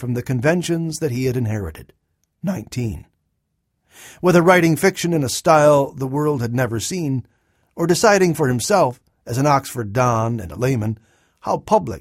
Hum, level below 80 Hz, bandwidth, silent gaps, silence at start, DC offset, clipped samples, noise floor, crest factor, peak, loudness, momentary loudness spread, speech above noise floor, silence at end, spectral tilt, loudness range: none; -48 dBFS; 16.5 kHz; none; 0 s; under 0.1%; under 0.1%; -72 dBFS; 20 dB; 0 dBFS; -19 LUFS; 13 LU; 54 dB; 0 s; -5.5 dB/octave; 7 LU